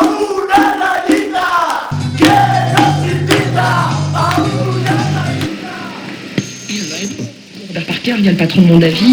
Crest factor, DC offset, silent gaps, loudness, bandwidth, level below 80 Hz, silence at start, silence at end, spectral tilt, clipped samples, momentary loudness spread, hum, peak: 12 dB; under 0.1%; none; -13 LUFS; over 20 kHz; -46 dBFS; 0 s; 0 s; -5.5 dB/octave; 0.1%; 14 LU; none; 0 dBFS